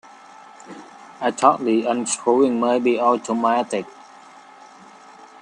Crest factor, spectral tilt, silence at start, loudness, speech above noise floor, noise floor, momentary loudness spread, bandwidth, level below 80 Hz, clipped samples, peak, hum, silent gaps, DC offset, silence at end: 20 dB; -4 dB/octave; 0.65 s; -20 LUFS; 26 dB; -45 dBFS; 22 LU; 10.5 kHz; -72 dBFS; under 0.1%; 0 dBFS; none; none; under 0.1%; 1.5 s